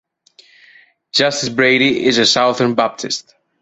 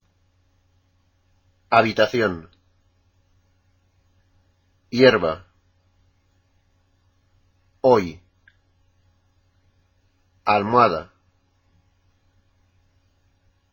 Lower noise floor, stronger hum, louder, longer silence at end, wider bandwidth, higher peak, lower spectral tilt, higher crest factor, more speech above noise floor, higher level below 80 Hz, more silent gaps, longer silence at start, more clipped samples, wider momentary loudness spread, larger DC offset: second, -50 dBFS vs -64 dBFS; neither; first, -14 LUFS vs -19 LUFS; second, 0.4 s vs 2.7 s; second, 8.2 kHz vs 17 kHz; about the same, 0 dBFS vs 0 dBFS; second, -3 dB/octave vs -6 dB/octave; second, 16 dB vs 26 dB; second, 35 dB vs 46 dB; about the same, -58 dBFS vs -58 dBFS; neither; second, 1.15 s vs 1.7 s; neither; second, 10 LU vs 15 LU; neither